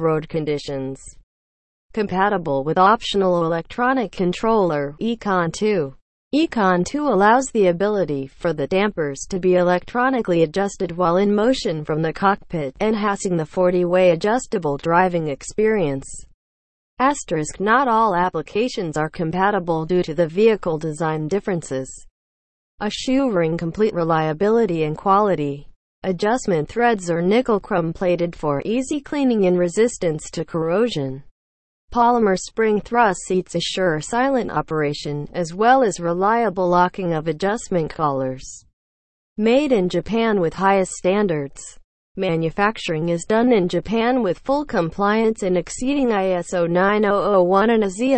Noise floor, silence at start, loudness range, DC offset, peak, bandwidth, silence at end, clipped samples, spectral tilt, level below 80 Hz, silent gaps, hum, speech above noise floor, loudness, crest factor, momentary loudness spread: under -90 dBFS; 0 s; 2 LU; under 0.1%; -4 dBFS; 8.8 kHz; 0 s; under 0.1%; -5.5 dB/octave; -46 dBFS; 1.23-1.89 s, 6.01-6.31 s, 16.34-16.97 s, 22.11-22.78 s, 25.76-26.02 s, 31.31-31.88 s, 38.73-39.36 s, 41.84-42.15 s; none; over 71 dB; -20 LUFS; 16 dB; 9 LU